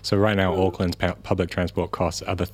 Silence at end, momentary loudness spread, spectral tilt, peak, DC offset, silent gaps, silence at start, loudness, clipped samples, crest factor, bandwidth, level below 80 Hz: 0 s; 6 LU; -6 dB/octave; -4 dBFS; under 0.1%; none; 0.05 s; -24 LUFS; under 0.1%; 20 dB; 15.5 kHz; -44 dBFS